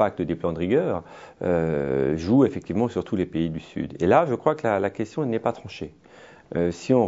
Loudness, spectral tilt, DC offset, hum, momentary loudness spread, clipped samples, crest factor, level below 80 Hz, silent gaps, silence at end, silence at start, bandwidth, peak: -24 LUFS; -7.5 dB/octave; under 0.1%; none; 12 LU; under 0.1%; 20 dB; -52 dBFS; none; 0 s; 0 s; 7.8 kHz; -4 dBFS